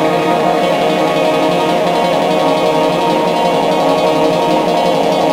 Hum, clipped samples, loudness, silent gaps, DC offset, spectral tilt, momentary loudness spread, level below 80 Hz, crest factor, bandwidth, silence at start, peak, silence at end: none; under 0.1%; -13 LUFS; none; under 0.1%; -5 dB/octave; 1 LU; -50 dBFS; 12 dB; 16.5 kHz; 0 s; -2 dBFS; 0 s